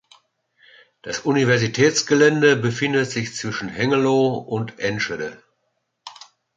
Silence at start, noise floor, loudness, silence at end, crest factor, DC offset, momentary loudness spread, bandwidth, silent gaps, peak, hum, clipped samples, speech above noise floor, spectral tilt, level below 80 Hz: 1.05 s; -73 dBFS; -20 LUFS; 0.45 s; 20 dB; under 0.1%; 14 LU; 9.2 kHz; none; -2 dBFS; none; under 0.1%; 53 dB; -4.5 dB/octave; -60 dBFS